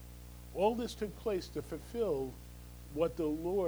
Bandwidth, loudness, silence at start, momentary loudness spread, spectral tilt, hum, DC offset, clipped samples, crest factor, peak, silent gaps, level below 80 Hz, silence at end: over 20 kHz; -37 LUFS; 0 s; 18 LU; -6 dB/octave; 60 Hz at -50 dBFS; under 0.1%; under 0.1%; 18 dB; -18 dBFS; none; -52 dBFS; 0 s